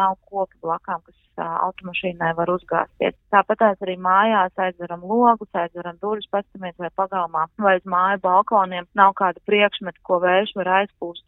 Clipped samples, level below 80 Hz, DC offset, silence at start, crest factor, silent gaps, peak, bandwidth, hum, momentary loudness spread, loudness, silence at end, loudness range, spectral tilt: under 0.1%; -60 dBFS; under 0.1%; 0 s; 20 dB; none; 0 dBFS; 4.1 kHz; none; 11 LU; -21 LUFS; 0.1 s; 4 LU; -9 dB/octave